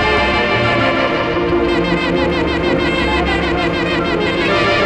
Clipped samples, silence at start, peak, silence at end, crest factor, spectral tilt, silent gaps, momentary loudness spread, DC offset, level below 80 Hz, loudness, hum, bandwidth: under 0.1%; 0 s; 0 dBFS; 0 s; 14 dB; -6 dB/octave; none; 3 LU; under 0.1%; -30 dBFS; -15 LUFS; none; 9.4 kHz